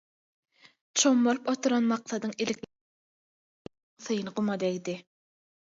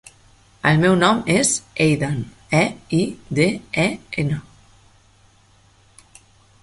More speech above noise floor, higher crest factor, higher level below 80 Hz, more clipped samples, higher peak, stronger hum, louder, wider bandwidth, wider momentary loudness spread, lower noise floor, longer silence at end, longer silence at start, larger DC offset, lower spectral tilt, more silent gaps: first, over 62 dB vs 35 dB; about the same, 18 dB vs 20 dB; second, -76 dBFS vs -50 dBFS; neither; second, -12 dBFS vs -2 dBFS; neither; second, -28 LUFS vs -19 LUFS; second, 7.8 kHz vs 11.5 kHz; first, 15 LU vs 9 LU; first, under -90 dBFS vs -54 dBFS; second, 0.75 s vs 2.2 s; first, 0.95 s vs 0.65 s; neither; about the same, -3.5 dB/octave vs -4.5 dB/octave; first, 2.81-3.65 s, 3.83-3.97 s vs none